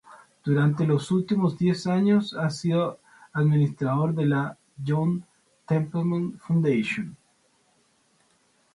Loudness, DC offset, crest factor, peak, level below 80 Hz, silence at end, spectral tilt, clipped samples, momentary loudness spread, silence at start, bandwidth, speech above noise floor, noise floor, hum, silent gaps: -25 LUFS; under 0.1%; 14 dB; -10 dBFS; -66 dBFS; 1.6 s; -8 dB/octave; under 0.1%; 9 LU; 0.1 s; 11.5 kHz; 42 dB; -65 dBFS; none; none